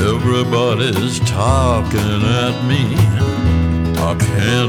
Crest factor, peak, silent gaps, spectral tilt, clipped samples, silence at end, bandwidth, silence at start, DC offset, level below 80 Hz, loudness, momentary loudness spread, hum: 12 dB; -2 dBFS; none; -6 dB/octave; under 0.1%; 0 s; 17 kHz; 0 s; under 0.1%; -26 dBFS; -15 LUFS; 3 LU; none